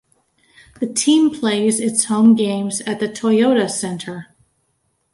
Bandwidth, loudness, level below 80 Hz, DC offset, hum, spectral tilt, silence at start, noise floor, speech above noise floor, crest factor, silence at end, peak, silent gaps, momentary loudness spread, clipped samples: 11.5 kHz; -17 LUFS; -62 dBFS; under 0.1%; none; -4 dB/octave; 0.8 s; -67 dBFS; 51 dB; 16 dB; 0.9 s; -2 dBFS; none; 13 LU; under 0.1%